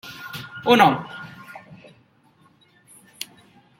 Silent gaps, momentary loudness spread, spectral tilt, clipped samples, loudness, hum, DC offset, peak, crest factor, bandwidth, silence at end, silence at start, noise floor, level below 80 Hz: none; 26 LU; -5 dB/octave; under 0.1%; -18 LUFS; none; under 0.1%; -2 dBFS; 24 dB; 16.5 kHz; 2.2 s; 0.05 s; -58 dBFS; -66 dBFS